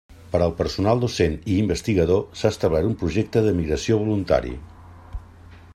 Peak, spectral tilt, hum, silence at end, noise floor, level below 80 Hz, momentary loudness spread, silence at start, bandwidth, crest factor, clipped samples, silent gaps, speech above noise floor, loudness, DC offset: -4 dBFS; -6.5 dB/octave; none; 0.05 s; -45 dBFS; -40 dBFS; 14 LU; 0.1 s; 13.5 kHz; 18 dB; under 0.1%; none; 24 dB; -22 LUFS; under 0.1%